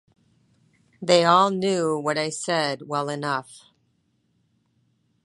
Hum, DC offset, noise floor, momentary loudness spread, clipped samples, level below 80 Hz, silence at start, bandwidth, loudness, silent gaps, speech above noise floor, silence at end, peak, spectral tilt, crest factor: none; under 0.1%; -69 dBFS; 11 LU; under 0.1%; -74 dBFS; 1 s; 11.5 kHz; -22 LUFS; none; 47 dB; 1.65 s; -2 dBFS; -4 dB/octave; 24 dB